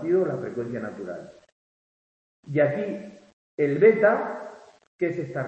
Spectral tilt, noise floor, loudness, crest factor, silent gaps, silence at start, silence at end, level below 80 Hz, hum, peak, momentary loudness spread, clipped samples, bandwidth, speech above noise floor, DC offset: -8.5 dB/octave; under -90 dBFS; -24 LUFS; 20 dB; 1.52-2.43 s, 3.33-3.58 s, 4.87-4.99 s; 0 s; 0 s; -70 dBFS; none; -6 dBFS; 20 LU; under 0.1%; 8.2 kHz; over 66 dB; under 0.1%